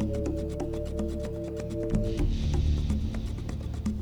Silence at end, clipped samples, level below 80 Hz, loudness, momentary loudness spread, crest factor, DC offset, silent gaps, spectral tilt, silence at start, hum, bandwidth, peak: 0 s; under 0.1%; -34 dBFS; -31 LUFS; 7 LU; 14 dB; under 0.1%; none; -7.5 dB/octave; 0 s; none; 11 kHz; -16 dBFS